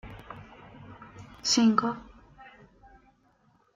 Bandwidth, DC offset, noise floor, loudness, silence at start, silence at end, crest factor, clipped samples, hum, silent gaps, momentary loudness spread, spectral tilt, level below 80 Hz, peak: 7.6 kHz; under 0.1%; -66 dBFS; -25 LUFS; 0.05 s; 1.35 s; 24 dB; under 0.1%; none; none; 27 LU; -3.5 dB/octave; -60 dBFS; -8 dBFS